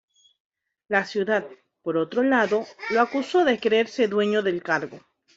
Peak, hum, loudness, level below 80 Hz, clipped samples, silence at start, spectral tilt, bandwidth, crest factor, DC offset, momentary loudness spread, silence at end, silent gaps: -6 dBFS; none; -23 LUFS; -70 dBFS; under 0.1%; 0.9 s; -5 dB/octave; 7.8 kHz; 20 dB; under 0.1%; 6 LU; 0.4 s; none